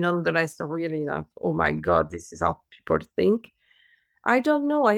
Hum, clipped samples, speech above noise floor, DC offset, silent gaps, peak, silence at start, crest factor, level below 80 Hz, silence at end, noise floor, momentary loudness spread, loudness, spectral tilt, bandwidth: none; under 0.1%; 38 dB; under 0.1%; none; -6 dBFS; 0 s; 18 dB; -52 dBFS; 0 s; -63 dBFS; 9 LU; -25 LUFS; -6.5 dB/octave; 15.5 kHz